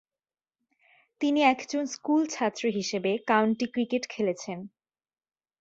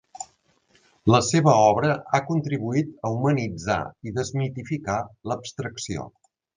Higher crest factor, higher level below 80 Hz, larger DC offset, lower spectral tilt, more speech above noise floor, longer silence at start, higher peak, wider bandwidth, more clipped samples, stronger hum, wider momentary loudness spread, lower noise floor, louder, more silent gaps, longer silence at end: about the same, 20 dB vs 22 dB; second, -74 dBFS vs -52 dBFS; neither; about the same, -4.5 dB/octave vs -5.5 dB/octave; first, over 63 dB vs 40 dB; first, 1.2 s vs 0.2 s; second, -8 dBFS vs -2 dBFS; second, 8 kHz vs 9.8 kHz; neither; neither; second, 9 LU vs 14 LU; first, under -90 dBFS vs -63 dBFS; second, -27 LUFS vs -24 LUFS; neither; first, 0.9 s vs 0.5 s